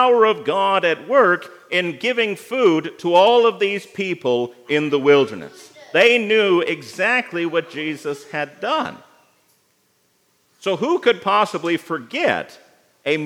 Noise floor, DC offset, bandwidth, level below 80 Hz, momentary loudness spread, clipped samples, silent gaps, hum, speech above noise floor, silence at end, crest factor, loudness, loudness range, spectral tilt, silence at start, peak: -63 dBFS; under 0.1%; 14.5 kHz; -78 dBFS; 12 LU; under 0.1%; none; none; 45 dB; 0 s; 18 dB; -18 LUFS; 7 LU; -4.5 dB/octave; 0 s; 0 dBFS